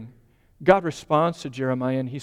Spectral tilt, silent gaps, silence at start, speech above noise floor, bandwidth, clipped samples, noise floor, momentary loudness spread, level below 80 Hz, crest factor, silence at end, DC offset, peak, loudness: -6.5 dB/octave; none; 0 s; 34 dB; 11.5 kHz; under 0.1%; -56 dBFS; 7 LU; -56 dBFS; 20 dB; 0 s; under 0.1%; -4 dBFS; -23 LUFS